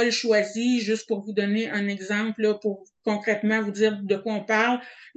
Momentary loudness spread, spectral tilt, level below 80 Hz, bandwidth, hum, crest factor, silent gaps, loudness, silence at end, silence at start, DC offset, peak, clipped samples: 6 LU; -4.5 dB/octave; -76 dBFS; 8.6 kHz; none; 16 dB; none; -25 LUFS; 0.1 s; 0 s; under 0.1%; -8 dBFS; under 0.1%